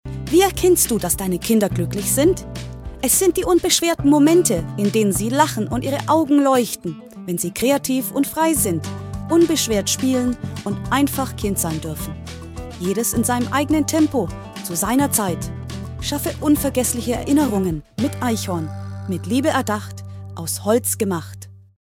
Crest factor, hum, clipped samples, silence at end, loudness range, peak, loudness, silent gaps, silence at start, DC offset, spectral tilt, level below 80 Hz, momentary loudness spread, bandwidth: 18 dB; none; under 0.1%; 0.25 s; 5 LU; 0 dBFS; -19 LUFS; none; 0.05 s; under 0.1%; -4.5 dB/octave; -40 dBFS; 14 LU; 16.5 kHz